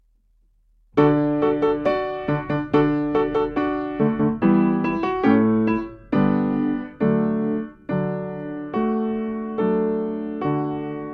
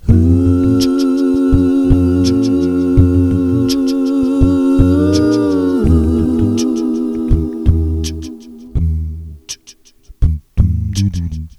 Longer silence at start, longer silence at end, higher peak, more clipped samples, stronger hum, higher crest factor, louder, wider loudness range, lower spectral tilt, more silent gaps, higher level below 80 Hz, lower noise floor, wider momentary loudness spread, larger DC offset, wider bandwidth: first, 0.95 s vs 0.05 s; about the same, 0 s vs 0.1 s; second, -4 dBFS vs 0 dBFS; second, under 0.1% vs 0.1%; neither; first, 18 dB vs 12 dB; second, -22 LUFS vs -14 LUFS; second, 4 LU vs 7 LU; first, -10 dB/octave vs -7.5 dB/octave; neither; second, -48 dBFS vs -22 dBFS; first, -60 dBFS vs -43 dBFS; about the same, 9 LU vs 11 LU; neither; second, 5.6 kHz vs 12.5 kHz